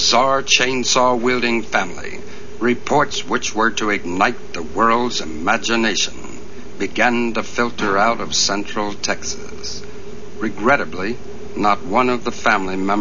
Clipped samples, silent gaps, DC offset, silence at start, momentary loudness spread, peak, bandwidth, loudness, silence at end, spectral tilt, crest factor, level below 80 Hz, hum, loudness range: under 0.1%; none; 6%; 0 s; 16 LU; 0 dBFS; 7.4 kHz; -18 LUFS; 0 s; -2.5 dB/octave; 20 dB; -46 dBFS; none; 3 LU